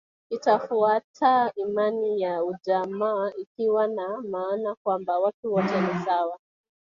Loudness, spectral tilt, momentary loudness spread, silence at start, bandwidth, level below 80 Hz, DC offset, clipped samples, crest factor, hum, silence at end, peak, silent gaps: -25 LUFS; -7 dB/octave; 8 LU; 0.3 s; 7.2 kHz; -72 dBFS; under 0.1%; under 0.1%; 18 dB; none; 0.5 s; -8 dBFS; 1.04-1.14 s, 3.47-3.55 s, 4.77-4.85 s, 5.34-5.43 s